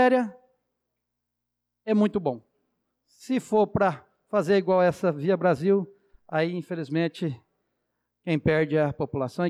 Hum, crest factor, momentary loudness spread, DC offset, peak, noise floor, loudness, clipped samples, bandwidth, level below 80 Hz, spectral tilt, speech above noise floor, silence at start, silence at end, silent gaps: 60 Hz at -60 dBFS; 14 dB; 12 LU; under 0.1%; -12 dBFS; -83 dBFS; -25 LUFS; under 0.1%; 12.5 kHz; -60 dBFS; -7.5 dB/octave; 59 dB; 0 s; 0 s; none